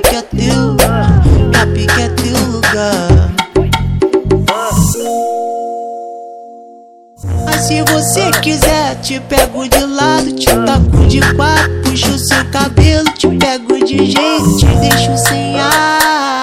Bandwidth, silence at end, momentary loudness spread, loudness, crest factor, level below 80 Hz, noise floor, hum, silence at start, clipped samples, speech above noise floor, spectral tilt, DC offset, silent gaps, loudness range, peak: 17 kHz; 0 s; 7 LU; -11 LUFS; 10 dB; -22 dBFS; -38 dBFS; none; 0 s; 0.6%; 27 dB; -4.5 dB/octave; under 0.1%; none; 5 LU; 0 dBFS